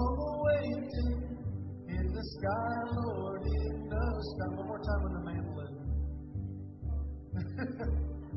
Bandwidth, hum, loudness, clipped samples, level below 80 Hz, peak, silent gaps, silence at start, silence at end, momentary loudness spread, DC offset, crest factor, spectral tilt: 5.8 kHz; none; -36 LUFS; under 0.1%; -38 dBFS; -18 dBFS; none; 0 s; 0 s; 8 LU; under 0.1%; 18 dB; -7.5 dB/octave